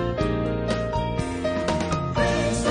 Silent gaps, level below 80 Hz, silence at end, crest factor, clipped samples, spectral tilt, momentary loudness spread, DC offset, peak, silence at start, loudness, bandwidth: none; -36 dBFS; 0 s; 16 dB; under 0.1%; -5.5 dB/octave; 4 LU; under 0.1%; -8 dBFS; 0 s; -25 LUFS; 10.5 kHz